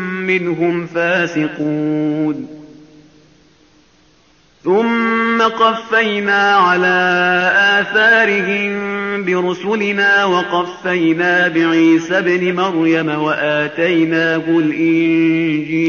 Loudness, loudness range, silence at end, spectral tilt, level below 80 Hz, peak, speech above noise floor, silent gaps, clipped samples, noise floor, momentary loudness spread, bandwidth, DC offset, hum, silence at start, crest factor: -14 LUFS; 8 LU; 0 s; -3 dB/octave; -60 dBFS; -2 dBFS; 38 dB; none; under 0.1%; -52 dBFS; 7 LU; 7 kHz; under 0.1%; none; 0 s; 14 dB